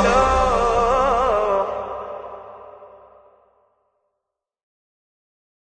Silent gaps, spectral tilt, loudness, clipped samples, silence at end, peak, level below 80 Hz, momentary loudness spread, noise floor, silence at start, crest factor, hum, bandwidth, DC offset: none; -5 dB/octave; -19 LUFS; under 0.1%; 2.8 s; -4 dBFS; -36 dBFS; 21 LU; -81 dBFS; 0 s; 18 dB; none; 9.4 kHz; under 0.1%